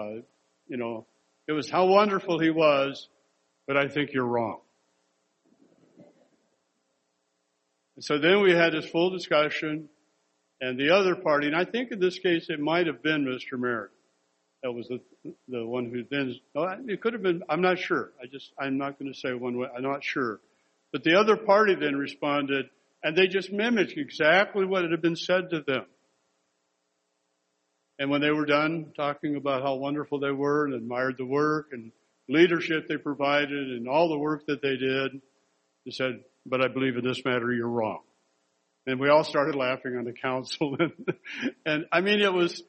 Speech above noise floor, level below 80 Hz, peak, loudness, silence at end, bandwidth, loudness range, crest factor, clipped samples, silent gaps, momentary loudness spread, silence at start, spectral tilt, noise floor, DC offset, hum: 50 dB; -74 dBFS; -6 dBFS; -26 LUFS; 0.05 s; 8.4 kHz; 7 LU; 20 dB; under 0.1%; none; 13 LU; 0 s; -5.5 dB/octave; -76 dBFS; under 0.1%; none